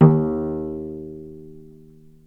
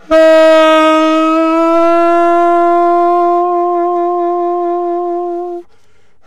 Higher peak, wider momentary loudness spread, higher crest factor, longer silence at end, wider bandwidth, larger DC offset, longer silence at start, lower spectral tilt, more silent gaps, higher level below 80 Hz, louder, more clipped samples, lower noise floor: about the same, 0 dBFS vs -2 dBFS; first, 23 LU vs 11 LU; first, 22 dB vs 8 dB; about the same, 0.65 s vs 0.65 s; second, 2.5 kHz vs 11 kHz; neither; about the same, 0 s vs 0.1 s; first, -12.5 dB/octave vs -3.5 dB/octave; neither; about the same, -48 dBFS vs -48 dBFS; second, -23 LUFS vs -10 LUFS; neither; second, -47 dBFS vs -54 dBFS